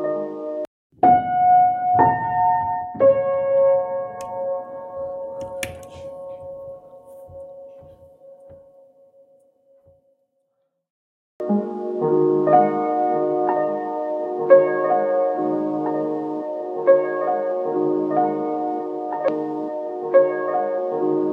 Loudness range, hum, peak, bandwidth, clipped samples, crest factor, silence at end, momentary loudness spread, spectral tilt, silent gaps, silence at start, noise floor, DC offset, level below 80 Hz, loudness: 16 LU; none; 0 dBFS; 12 kHz; under 0.1%; 22 dB; 0 s; 19 LU; -7.5 dB/octave; 0.67-0.90 s, 10.90-11.39 s; 0 s; -72 dBFS; under 0.1%; -62 dBFS; -20 LUFS